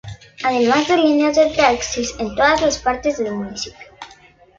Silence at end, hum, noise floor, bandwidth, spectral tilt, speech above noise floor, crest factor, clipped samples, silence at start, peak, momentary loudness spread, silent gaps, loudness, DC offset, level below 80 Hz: 0.5 s; none; -48 dBFS; 7.6 kHz; -3.5 dB/octave; 31 dB; 16 dB; under 0.1%; 0.05 s; -2 dBFS; 14 LU; none; -17 LUFS; under 0.1%; -44 dBFS